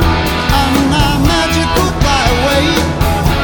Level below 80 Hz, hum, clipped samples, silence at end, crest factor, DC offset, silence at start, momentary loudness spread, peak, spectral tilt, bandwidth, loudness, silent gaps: -18 dBFS; none; under 0.1%; 0 s; 12 dB; under 0.1%; 0 s; 2 LU; 0 dBFS; -5 dB/octave; over 20 kHz; -12 LUFS; none